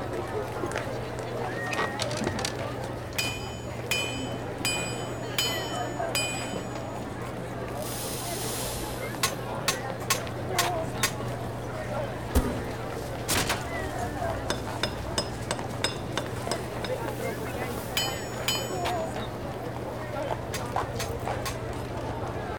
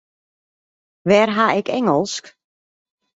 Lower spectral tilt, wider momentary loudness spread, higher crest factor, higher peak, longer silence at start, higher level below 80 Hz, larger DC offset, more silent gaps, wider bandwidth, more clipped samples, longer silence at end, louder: second, -3.5 dB/octave vs -5 dB/octave; second, 7 LU vs 12 LU; about the same, 22 dB vs 18 dB; second, -8 dBFS vs -2 dBFS; second, 0 s vs 1.05 s; first, -44 dBFS vs -62 dBFS; first, 0.2% vs under 0.1%; neither; first, 19.5 kHz vs 8 kHz; neither; second, 0 s vs 0.85 s; second, -31 LUFS vs -18 LUFS